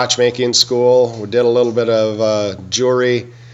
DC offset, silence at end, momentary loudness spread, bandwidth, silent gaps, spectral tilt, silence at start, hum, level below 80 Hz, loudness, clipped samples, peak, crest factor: under 0.1%; 0 s; 5 LU; 13.5 kHz; none; -3.5 dB/octave; 0 s; none; -60 dBFS; -14 LUFS; under 0.1%; 0 dBFS; 14 dB